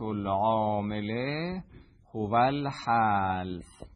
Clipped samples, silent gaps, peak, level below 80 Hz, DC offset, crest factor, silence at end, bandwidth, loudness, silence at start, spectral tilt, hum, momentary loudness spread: under 0.1%; none; -12 dBFS; -56 dBFS; under 0.1%; 16 dB; 0.1 s; 10.5 kHz; -29 LUFS; 0 s; -7.5 dB/octave; none; 13 LU